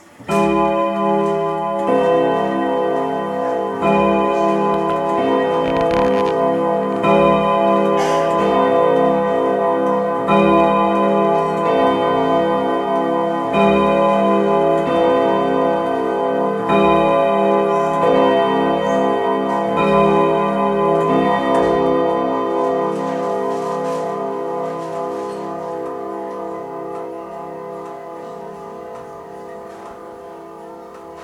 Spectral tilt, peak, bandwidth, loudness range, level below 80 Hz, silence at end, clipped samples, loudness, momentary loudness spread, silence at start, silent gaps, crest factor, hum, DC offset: -7 dB/octave; -2 dBFS; 12.5 kHz; 12 LU; -48 dBFS; 0 s; under 0.1%; -17 LUFS; 16 LU; 0.2 s; none; 14 dB; none; under 0.1%